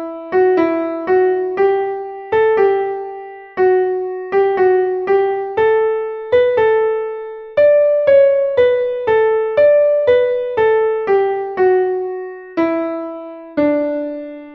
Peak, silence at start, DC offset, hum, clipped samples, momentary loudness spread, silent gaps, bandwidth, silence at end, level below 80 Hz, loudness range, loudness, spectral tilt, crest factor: -2 dBFS; 0 s; under 0.1%; none; under 0.1%; 13 LU; none; 5.2 kHz; 0 s; -54 dBFS; 4 LU; -15 LUFS; -7.5 dB/octave; 12 dB